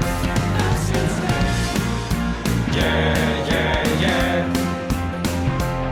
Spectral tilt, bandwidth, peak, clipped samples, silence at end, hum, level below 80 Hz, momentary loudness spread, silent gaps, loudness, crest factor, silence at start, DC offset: -5.5 dB/octave; 18.5 kHz; -6 dBFS; under 0.1%; 0 s; none; -28 dBFS; 5 LU; none; -21 LUFS; 14 dB; 0 s; under 0.1%